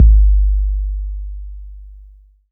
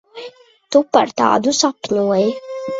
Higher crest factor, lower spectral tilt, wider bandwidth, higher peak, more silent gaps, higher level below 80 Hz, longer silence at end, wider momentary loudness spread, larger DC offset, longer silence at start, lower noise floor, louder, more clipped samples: about the same, 14 dB vs 18 dB; first, -14.5 dB/octave vs -3.5 dB/octave; second, 0.3 kHz vs 8 kHz; about the same, 0 dBFS vs 0 dBFS; neither; first, -14 dBFS vs -60 dBFS; first, 0.55 s vs 0 s; first, 24 LU vs 19 LU; neither; second, 0 s vs 0.15 s; first, -44 dBFS vs -39 dBFS; about the same, -18 LUFS vs -16 LUFS; neither